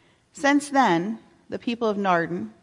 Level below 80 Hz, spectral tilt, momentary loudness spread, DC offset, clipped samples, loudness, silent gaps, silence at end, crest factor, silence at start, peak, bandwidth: -68 dBFS; -5 dB/octave; 12 LU; under 0.1%; under 0.1%; -23 LUFS; none; 0.1 s; 16 dB; 0.35 s; -8 dBFS; 11.5 kHz